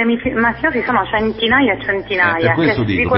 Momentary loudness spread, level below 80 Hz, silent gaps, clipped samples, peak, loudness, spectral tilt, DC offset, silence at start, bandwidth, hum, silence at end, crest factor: 4 LU; -38 dBFS; none; under 0.1%; 0 dBFS; -15 LUFS; -11 dB/octave; 0.2%; 0 s; 5.8 kHz; none; 0 s; 16 dB